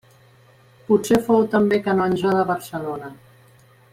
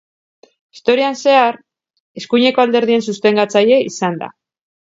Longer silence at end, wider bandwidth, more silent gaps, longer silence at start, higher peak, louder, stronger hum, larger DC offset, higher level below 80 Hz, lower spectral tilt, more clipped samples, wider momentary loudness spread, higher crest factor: first, 0.8 s vs 0.55 s; first, 16 kHz vs 7.8 kHz; second, none vs 2.00-2.15 s; first, 0.9 s vs 0.75 s; second, -4 dBFS vs 0 dBFS; second, -20 LUFS vs -14 LUFS; neither; neither; first, -56 dBFS vs -68 dBFS; first, -6.5 dB/octave vs -4.5 dB/octave; neither; about the same, 13 LU vs 13 LU; about the same, 16 dB vs 16 dB